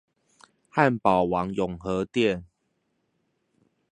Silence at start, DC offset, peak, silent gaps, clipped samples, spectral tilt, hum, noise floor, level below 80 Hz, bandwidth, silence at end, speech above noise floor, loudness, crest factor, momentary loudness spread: 0.75 s; under 0.1%; -4 dBFS; none; under 0.1%; -7 dB/octave; none; -75 dBFS; -54 dBFS; 10 kHz; 1.5 s; 51 dB; -25 LUFS; 24 dB; 8 LU